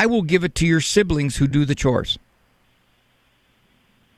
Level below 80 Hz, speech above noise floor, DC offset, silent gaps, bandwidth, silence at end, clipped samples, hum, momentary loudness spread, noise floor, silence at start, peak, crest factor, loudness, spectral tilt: -38 dBFS; 43 dB; under 0.1%; none; 13.5 kHz; 2 s; under 0.1%; none; 5 LU; -61 dBFS; 0 s; -4 dBFS; 18 dB; -19 LUFS; -5 dB/octave